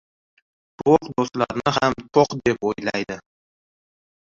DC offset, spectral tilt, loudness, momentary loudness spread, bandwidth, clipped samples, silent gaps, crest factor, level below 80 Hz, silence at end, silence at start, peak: under 0.1%; -5.5 dB/octave; -21 LUFS; 8 LU; 7.6 kHz; under 0.1%; none; 20 dB; -52 dBFS; 1.15 s; 0.8 s; -2 dBFS